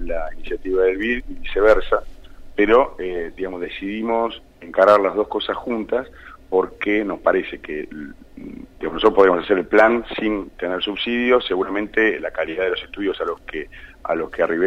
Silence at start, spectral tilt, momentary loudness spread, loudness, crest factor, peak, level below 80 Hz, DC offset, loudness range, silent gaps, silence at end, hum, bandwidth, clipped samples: 0 s; -6 dB/octave; 15 LU; -20 LUFS; 18 dB; -2 dBFS; -38 dBFS; under 0.1%; 4 LU; none; 0 s; none; 8.6 kHz; under 0.1%